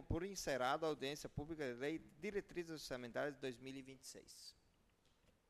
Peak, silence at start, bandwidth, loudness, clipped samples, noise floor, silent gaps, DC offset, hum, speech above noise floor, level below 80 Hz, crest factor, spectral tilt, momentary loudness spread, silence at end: -28 dBFS; 0 s; 13 kHz; -46 LUFS; under 0.1%; -76 dBFS; none; under 0.1%; none; 30 dB; -64 dBFS; 20 dB; -4.5 dB/octave; 15 LU; 0.95 s